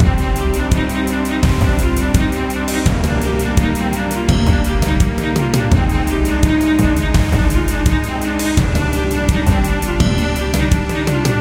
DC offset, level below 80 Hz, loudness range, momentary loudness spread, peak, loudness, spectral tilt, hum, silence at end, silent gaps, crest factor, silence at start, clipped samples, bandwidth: under 0.1%; -18 dBFS; 1 LU; 3 LU; 0 dBFS; -16 LUFS; -5.5 dB/octave; none; 0 s; none; 14 dB; 0 s; under 0.1%; 17 kHz